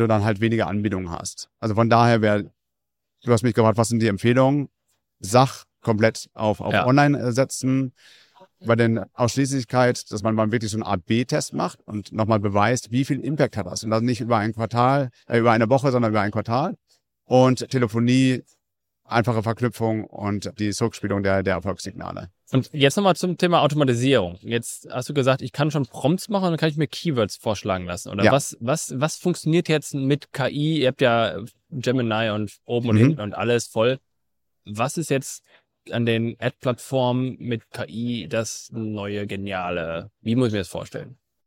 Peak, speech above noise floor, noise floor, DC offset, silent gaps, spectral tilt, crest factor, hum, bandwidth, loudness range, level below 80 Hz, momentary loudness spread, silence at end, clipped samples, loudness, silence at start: -4 dBFS; 62 dB; -84 dBFS; under 0.1%; none; -6 dB/octave; 18 dB; none; 16.5 kHz; 5 LU; -58 dBFS; 11 LU; 0.35 s; under 0.1%; -22 LUFS; 0 s